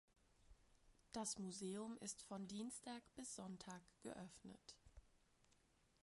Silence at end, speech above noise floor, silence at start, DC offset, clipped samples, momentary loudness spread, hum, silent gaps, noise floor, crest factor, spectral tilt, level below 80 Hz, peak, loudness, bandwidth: 0.5 s; 25 dB; 0.3 s; under 0.1%; under 0.1%; 13 LU; none; none; -78 dBFS; 22 dB; -3.5 dB/octave; -76 dBFS; -34 dBFS; -53 LUFS; 11.5 kHz